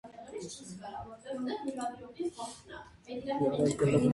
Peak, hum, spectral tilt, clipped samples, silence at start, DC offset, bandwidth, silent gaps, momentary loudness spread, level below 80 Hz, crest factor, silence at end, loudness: -14 dBFS; none; -6.5 dB/octave; under 0.1%; 0.05 s; under 0.1%; 11.5 kHz; none; 16 LU; -62 dBFS; 18 dB; 0 s; -35 LUFS